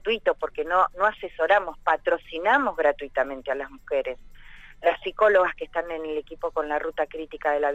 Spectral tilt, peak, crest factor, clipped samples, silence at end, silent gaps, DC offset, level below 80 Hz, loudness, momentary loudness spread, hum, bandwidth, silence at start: -4.5 dB/octave; -8 dBFS; 18 dB; under 0.1%; 0 s; none; under 0.1%; -50 dBFS; -25 LUFS; 10 LU; none; 8 kHz; 0.05 s